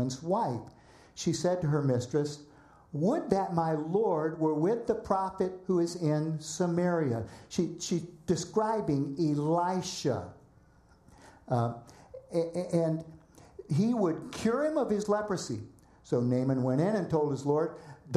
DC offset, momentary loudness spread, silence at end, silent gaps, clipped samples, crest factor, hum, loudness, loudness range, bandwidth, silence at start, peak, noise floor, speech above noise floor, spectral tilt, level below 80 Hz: under 0.1%; 9 LU; 0 s; none; under 0.1%; 20 dB; none; -31 LUFS; 4 LU; 13 kHz; 0 s; -10 dBFS; -61 dBFS; 31 dB; -6.5 dB/octave; -62 dBFS